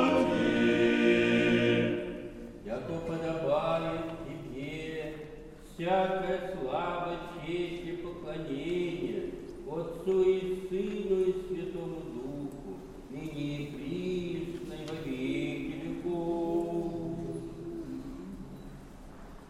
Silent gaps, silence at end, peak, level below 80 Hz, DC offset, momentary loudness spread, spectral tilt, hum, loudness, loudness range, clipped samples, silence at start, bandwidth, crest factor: none; 0 s; -14 dBFS; -52 dBFS; under 0.1%; 18 LU; -6.5 dB/octave; none; -32 LUFS; 8 LU; under 0.1%; 0 s; 13 kHz; 18 dB